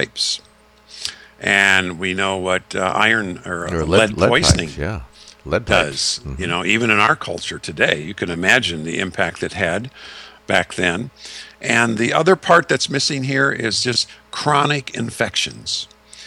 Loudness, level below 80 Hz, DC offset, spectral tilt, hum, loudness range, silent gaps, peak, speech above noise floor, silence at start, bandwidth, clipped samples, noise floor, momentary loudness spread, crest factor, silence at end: -18 LUFS; -40 dBFS; under 0.1%; -3.5 dB/octave; none; 3 LU; none; 0 dBFS; 28 dB; 0 s; 17 kHz; under 0.1%; -46 dBFS; 13 LU; 18 dB; 0 s